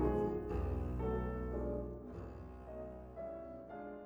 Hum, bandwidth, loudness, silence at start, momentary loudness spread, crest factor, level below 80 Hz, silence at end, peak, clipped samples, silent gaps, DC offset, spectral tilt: none; 5 kHz; -42 LUFS; 0 s; 11 LU; 18 dB; -46 dBFS; 0 s; -24 dBFS; under 0.1%; none; under 0.1%; -10 dB/octave